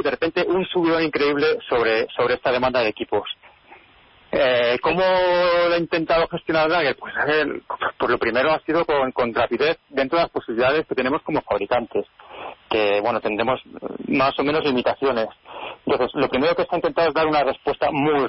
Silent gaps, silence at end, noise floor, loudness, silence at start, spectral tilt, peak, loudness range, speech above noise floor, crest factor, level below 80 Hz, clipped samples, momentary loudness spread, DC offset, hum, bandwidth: none; 0 s; -52 dBFS; -21 LUFS; 0 s; -9.5 dB/octave; -8 dBFS; 3 LU; 31 dB; 12 dB; -52 dBFS; under 0.1%; 8 LU; under 0.1%; none; 5.8 kHz